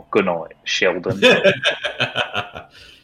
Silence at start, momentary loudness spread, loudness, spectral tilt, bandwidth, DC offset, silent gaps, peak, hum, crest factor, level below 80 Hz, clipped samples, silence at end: 0.1 s; 13 LU; -18 LUFS; -4 dB/octave; 15.5 kHz; under 0.1%; none; -4 dBFS; none; 16 dB; -58 dBFS; under 0.1%; 0.4 s